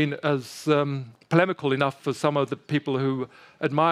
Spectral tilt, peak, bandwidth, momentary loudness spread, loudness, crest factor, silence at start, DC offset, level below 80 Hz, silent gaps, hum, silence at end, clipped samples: -6.5 dB/octave; -4 dBFS; 14 kHz; 8 LU; -25 LUFS; 22 dB; 0 s; under 0.1%; -72 dBFS; none; none; 0 s; under 0.1%